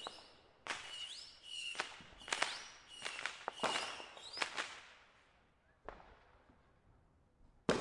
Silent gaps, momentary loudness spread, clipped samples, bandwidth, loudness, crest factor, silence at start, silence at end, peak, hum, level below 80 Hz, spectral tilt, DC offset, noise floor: none; 19 LU; under 0.1%; 11.5 kHz; -43 LUFS; 34 dB; 0 s; 0 s; -12 dBFS; none; -72 dBFS; -2 dB/octave; under 0.1%; -72 dBFS